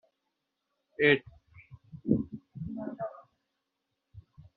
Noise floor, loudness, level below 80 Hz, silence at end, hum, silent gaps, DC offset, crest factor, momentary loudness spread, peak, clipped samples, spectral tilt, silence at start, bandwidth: -84 dBFS; -31 LUFS; -60 dBFS; 0.15 s; none; none; under 0.1%; 26 dB; 17 LU; -8 dBFS; under 0.1%; -4.5 dB/octave; 1 s; 4.7 kHz